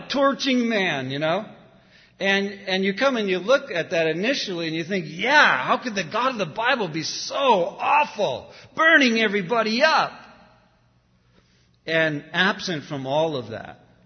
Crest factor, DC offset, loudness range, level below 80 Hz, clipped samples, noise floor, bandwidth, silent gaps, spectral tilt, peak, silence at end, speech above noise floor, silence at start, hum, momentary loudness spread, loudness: 22 dB; under 0.1%; 6 LU; -66 dBFS; under 0.1%; -61 dBFS; 6.6 kHz; none; -4 dB/octave; -2 dBFS; 0.3 s; 39 dB; 0 s; none; 12 LU; -21 LUFS